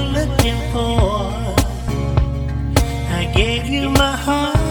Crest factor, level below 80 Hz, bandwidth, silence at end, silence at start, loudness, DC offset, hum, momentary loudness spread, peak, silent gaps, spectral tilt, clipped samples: 18 dB; -22 dBFS; 19 kHz; 0 s; 0 s; -18 LUFS; under 0.1%; none; 5 LU; 0 dBFS; none; -5.5 dB/octave; under 0.1%